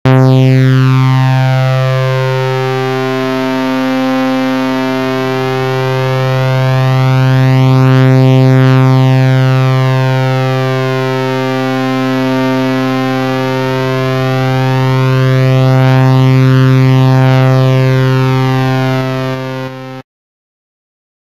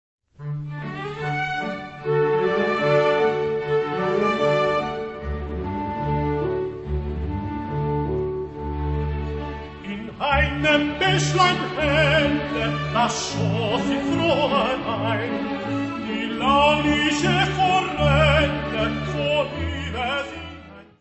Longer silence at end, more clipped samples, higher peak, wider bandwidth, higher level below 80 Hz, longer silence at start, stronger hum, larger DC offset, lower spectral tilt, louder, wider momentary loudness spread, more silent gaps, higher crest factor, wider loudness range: first, 1.35 s vs 0.2 s; neither; first, 0 dBFS vs -4 dBFS; second, 7.4 kHz vs 8.4 kHz; second, -46 dBFS vs -36 dBFS; second, 0.05 s vs 0.4 s; neither; first, 1% vs under 0.1%; first, -7.5 dB/octave vs -5.5 dB/octave; first, -10 LUFS vs -22 LUFS; second, 6 LU vs 12 LU; neither; second, 10 dB vs 18 dB; about the same, 5 LU vs 7 LU